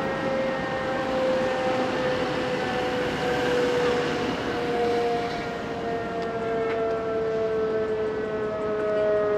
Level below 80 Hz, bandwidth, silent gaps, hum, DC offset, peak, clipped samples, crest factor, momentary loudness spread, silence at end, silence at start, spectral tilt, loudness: -52 dBFS; 13.5 kHz; none; none; under 0.1%; -12 dBFS; under 0.1%; 14 dB; 5 LU; 0 s; 0 s; -5.5 dB/octave; -26 LUFS